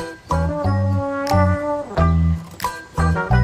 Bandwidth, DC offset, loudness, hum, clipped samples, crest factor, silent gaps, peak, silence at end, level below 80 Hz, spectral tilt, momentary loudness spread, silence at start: 15.5 kHz; under 0.1%; -20 LUFS; none; under 0.1%; 16 dB; none; -2 dBFS; 0 s; -30 dBFS; -7.5 dB/octave; 7 LU; 0 s